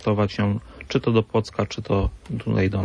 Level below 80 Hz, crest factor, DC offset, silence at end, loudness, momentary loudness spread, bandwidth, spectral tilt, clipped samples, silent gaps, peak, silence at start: -38 dBFS; 16 dB; under 0.1%; 0 s; -24 LUFS; 7 LU; 9.8 kHz; -7.5 dB/octave; under 0.1%; none; -6 dBFS; 0 s